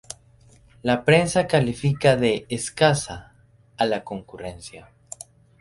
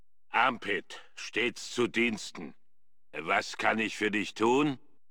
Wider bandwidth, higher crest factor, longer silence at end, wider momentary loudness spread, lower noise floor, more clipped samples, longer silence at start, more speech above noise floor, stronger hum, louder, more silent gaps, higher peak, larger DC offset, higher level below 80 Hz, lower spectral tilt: second, 11.5 kHz vs 17 kHz; about the same, 20 dB vs 20 dB; first, 0.8 s vs 0.35 s; first, 22 LU vs 15 LU; second, -54 dBFS vs -85 dBFS; neither; first, 0.85 s vs 0.3 s; second, 32 dB vs 54 dB; neither; first, -21 LUFS vs -30 LUFS; neither; first, -4 dBFS vs -12 dBFS; second, under 0.1% vs 0.3%; first, -52 dBFS vs -72 dBFS; about the same, -5 dB/octave vs -4 dB/octave